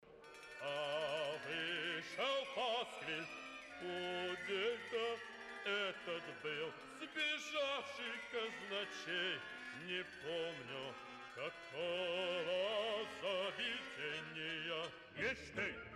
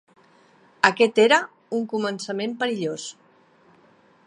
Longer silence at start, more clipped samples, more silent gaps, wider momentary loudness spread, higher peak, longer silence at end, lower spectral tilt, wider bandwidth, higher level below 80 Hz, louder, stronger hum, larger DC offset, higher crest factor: second, 0 s vs 0.85 s; neither; neither; second, 9 LU vs 12 LU; second, -28 dBFS vs 0 dBFS; second, 0 s vs 1.15 s; about the same, -3 dB/octave vs -3.5 dB/octave; first, 14 kHz vs 11 kHz; second, -76 dBFS vs -70 dBFS; second, -42 LUFS vs -22 LUFS; neither; neither; second, 14 dB vs 24 dB